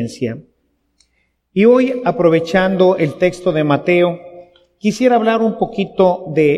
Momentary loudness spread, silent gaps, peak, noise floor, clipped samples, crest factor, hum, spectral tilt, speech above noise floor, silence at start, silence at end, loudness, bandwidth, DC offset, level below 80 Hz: 10 LU; none; 0 dBFS; -64 dBFS; under 0.1%; 14 dB; none; -7 dB/octave; 50 dB; 0 s; 0 s; -15 LUFS; 11.5 kHz; under 0.1%; -52 dBFS